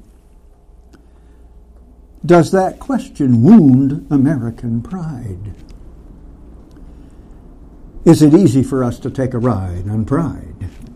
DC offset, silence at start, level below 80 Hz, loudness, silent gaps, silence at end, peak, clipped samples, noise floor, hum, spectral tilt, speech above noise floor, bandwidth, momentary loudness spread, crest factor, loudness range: under 0.1%; 2.25 s; -38 dBFS; -14 LUFS; none; 0 s; 0 dBFS; under 0.1%; -44 dBFS; none; -8 dB/octave; 31 dB; 13.5 kHz; 20 LU; 16 dB; 11 LU